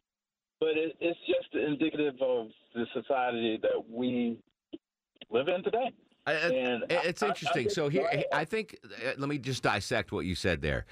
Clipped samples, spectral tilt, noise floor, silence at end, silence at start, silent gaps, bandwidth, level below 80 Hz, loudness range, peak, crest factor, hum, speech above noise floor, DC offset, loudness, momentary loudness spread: under 0.1%; -5 dB/octave; under -90 dBFS; 0.05 s; 0.6 s; none; 15 kHz; -56 dBFS; 3 LU; -16 dBFS; 16 dB; none; over 59 dB; under 0.1%; -31 LUFS; 8 LU